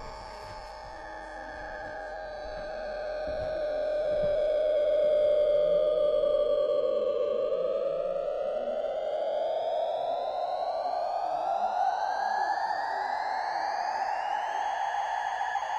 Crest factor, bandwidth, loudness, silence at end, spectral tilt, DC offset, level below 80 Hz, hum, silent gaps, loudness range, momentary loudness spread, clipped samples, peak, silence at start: 12 dB; 9 kHz; -29 LUFS; 0 s; -4 dB/octave; under 0.1%; -54 dBFS; none; none; 7 LU; 13 LU; under 0.1%; -16 dBFS; 0 s